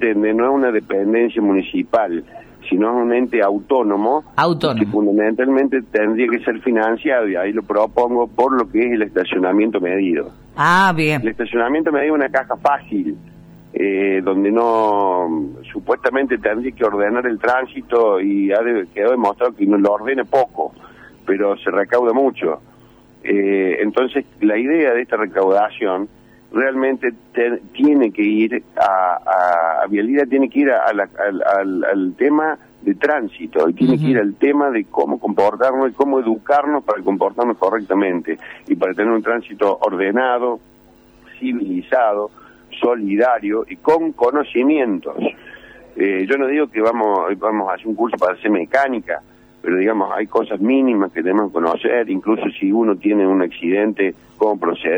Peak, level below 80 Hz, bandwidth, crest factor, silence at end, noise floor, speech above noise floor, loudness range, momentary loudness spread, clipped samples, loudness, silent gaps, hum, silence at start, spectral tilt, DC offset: 0 dBFS; -56 dBFS; over 20 kHz; 18 dB; 0 s; -48 dBFS; 31 dB; 2 LU; 7 LU; under 0.1%; -17 LUFS; none; none; 0 s; -7 dB/octave; under 0.1%